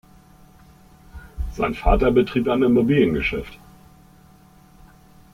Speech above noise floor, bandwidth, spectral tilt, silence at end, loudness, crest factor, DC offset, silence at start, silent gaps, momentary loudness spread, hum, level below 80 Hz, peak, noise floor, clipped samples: 32 dB; 15.5 kHz; -8 dB/octave; 1.8 s; -20 LUFS; 18 dB; under 0.1%; 1.15 s; none; 17 LU; none; -32 dBFS; -4 dBFS; -50 dBFS; under 0.1%